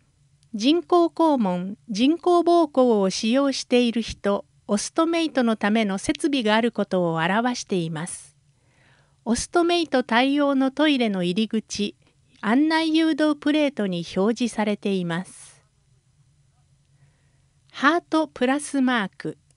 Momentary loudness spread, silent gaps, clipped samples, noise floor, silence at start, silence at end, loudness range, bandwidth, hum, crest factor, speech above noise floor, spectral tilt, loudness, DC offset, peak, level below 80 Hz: 9 LU; none; under 0.1%; -62 dBFS; 0.55 s; 0.25 s; 7 LU; 11.5 kHz; none; 20 dB; 40 dB; -4.5 dB/octave; -22 LUFS; under 0.1%; -4 dBFS; -56 dBFS